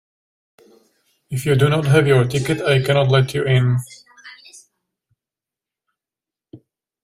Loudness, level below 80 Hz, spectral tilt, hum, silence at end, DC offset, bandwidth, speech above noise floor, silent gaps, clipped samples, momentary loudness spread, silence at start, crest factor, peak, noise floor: -17 LUFS; -52 dBFS; -6.5 dB/octave; none; 0.5 s; under 0.1%; 15 kHz; 73 dB; none; under 0.1%; 11 LU; 1.3 s; 18 dB; -2 dBFS; -89 dBFS